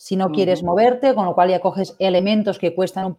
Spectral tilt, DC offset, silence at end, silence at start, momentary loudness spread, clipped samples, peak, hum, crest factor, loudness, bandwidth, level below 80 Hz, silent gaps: -6.5 dB/octave; under 0.1%; 0.05 s; 0.05 s; 6 LU; under 0.1%; -2 dBFS; none; 16 dB; -18 LUFS; 12.5 kHz; -58 dBFS; none